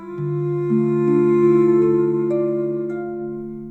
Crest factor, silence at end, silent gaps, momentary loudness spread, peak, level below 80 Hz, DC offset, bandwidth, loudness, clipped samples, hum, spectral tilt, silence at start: 12 dB; 0 s; none; 13 LU; -6 dBFS; -58 dBFS; under 0.1%; 4.1 kHz; -19 LUFS; under 0.1%; none; -11 dB/octave; 0 s